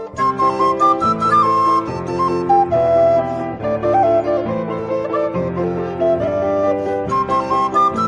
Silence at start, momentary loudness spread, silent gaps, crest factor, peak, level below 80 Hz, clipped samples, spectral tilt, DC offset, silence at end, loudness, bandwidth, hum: 0 s; 8 LU; none; 12 dB; -4 dBFS; -48 dBFS; under 0.1%; -7 dB/octave; under 0.1%; 0 s; -17 LUFS; 10.5 kHz; none